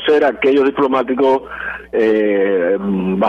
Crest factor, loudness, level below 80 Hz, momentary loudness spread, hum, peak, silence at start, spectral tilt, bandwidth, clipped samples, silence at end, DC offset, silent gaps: 10 dB; -15 LUFS; -48 dBFS; 6 LU; none; -4 dBFS; 0 s; -7.5 dB/octave; 6.6 kHz; under 0.1%; 0 s; under 0.1%; none